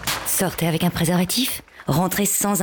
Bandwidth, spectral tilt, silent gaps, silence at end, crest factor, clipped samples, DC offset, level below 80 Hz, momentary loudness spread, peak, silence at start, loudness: over 20 kHz; -4 dB/octave; none; 0 s; 12 dB; under 0.1%; under 0.1%; -46 dBFS; 5 LU; -10 dBFS; 0 s; -21 LUFS